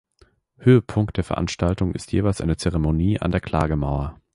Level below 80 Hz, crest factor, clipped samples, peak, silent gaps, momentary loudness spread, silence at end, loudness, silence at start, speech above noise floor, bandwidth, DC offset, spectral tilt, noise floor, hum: -34 dBFS; 18 dB; under 0.1%; -4 dBFS; none; 8 LU; 0.2 s; -22 LUFS; 0.6 s; 38 dB; 11.5 kHz; under 0.1%; -7 dB/octave; -59 dBFS; none